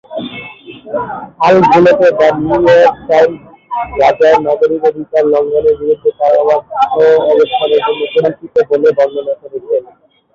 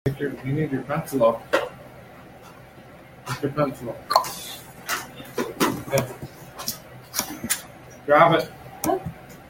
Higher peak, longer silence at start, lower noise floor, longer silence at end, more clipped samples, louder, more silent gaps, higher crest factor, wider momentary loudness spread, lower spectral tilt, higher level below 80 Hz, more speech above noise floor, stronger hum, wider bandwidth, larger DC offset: about the same, 0 dBFS vs 0 dBFS; about the same, 0.1 s vs 0.05 s; second, -31 dBFS vs -46 dBFS; first, 0.5 s vs 0 s; neither; first, -11 LUFS vs -24 LUFS; neither; second, 10 dB vs 24 dB; second, 14 LU vs 23 LU; first, -6.5 dB/octave vs -4.5 dB/octave; first, -46 dBFS vs -56 dBFS; about the same, 21 dB vs 23 dB; neither; second, 7.2 kHz vs 17 kHz; neither